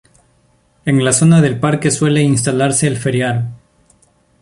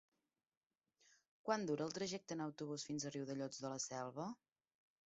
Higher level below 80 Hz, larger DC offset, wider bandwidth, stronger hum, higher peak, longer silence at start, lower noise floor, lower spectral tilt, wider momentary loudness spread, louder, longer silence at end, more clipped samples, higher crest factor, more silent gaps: first, -48 dBFS vs -86 dBFS; neither; first, 11.5 kHz vs 8 kHz; neither; first, -2 dBFS vs -24 dBFS; second, 0.85 s vs 1.45 s; second, -55 dBFS vs under -90 dBFS; about the same, -5 dB/octave vs -4.5 dB/octave; about the same, 9 LU vs 8 LU; first, -14 LUFS vs -45 LUFS; first, 0.85 s vs 0.7 s; neither; second, 14 dB vs 24 dB; neither